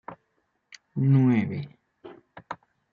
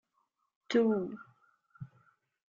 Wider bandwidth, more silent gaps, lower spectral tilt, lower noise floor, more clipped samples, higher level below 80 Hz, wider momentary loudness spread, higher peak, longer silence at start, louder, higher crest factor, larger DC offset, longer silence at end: about the same, 6.8 kHz vs 7.4 kHz; neither; first, -9.5 dB/octave vs -5 dB/octave; second, -74 dBFS vs -79 dBFS; neither; first, -68 dBFS vs -78 dBFS; about the same, 23 LU vs 23 LU; first, -10 dBFS vs -16 dBFS; second, 0.1 s vs 0.7 s; first, -24 LUFS vs -31 LUFS; about the same, 16 dB vs 20 dB; neither; second, 0.35 s vs 0.7 s